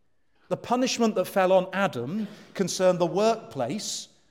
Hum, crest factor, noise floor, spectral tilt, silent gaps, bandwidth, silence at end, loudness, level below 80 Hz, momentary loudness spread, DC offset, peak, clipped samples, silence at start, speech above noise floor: none; 16 dB; -68 dBFS; -4.5 dB/octave; none; 16.5 kHz; 0.25 s; -26 LUFS; -74 dBFS; 11 LU; under 0.1%; -10 dBFS; under 0.1%; 0.5 s; 43 dB